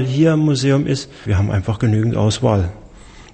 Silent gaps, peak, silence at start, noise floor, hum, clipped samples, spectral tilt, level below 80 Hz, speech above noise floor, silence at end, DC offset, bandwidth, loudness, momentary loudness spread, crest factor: none; -2 dBFS; 0 s; -40 dBFS; none; under 0.1%; -6.5 dB/octave; -38 dBFS; 24 dB; 0.1 s; under 0.1%; 8.8 kHz; -17 LUFS; 7 LU; 16 dB